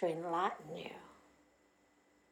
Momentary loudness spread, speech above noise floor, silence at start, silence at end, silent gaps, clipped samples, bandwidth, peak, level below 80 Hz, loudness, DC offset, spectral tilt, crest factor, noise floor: 19 LU; 33 dB; 0 s; 1.15 s; none; under 0.1%; 16.5 kHz; -22 dBFS; -82 dBFS; -40 LUFS; under 0.1%; -6 dB/octave; 20 dB; -71 dBFS